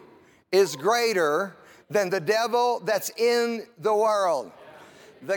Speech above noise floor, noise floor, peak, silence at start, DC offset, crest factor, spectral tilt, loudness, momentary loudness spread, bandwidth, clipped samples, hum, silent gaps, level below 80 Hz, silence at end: 31 dB; -54 dBFS; -8 dBFS; 0.5 s; under 0.1%; 16 dB; -3.5 dB/octave; -24 LUFS; 7 LU; 18 kHz; under 0.1%; none; none; -80 dBFS; 0 s